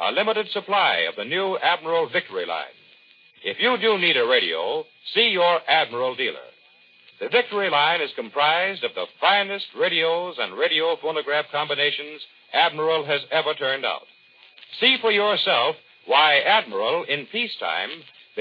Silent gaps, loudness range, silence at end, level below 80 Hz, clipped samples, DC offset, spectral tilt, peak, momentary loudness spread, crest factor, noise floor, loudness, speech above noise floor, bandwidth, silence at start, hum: none; 3 LU; 0 s; -90 dBFS; under 0.1%; under 0.1%; -5 dB/octave; -4 dBFS; 11 LU; 18 dB; -55 dBFS; -21 LUFS; 32 dB; 5.2 kHz; 0 s; none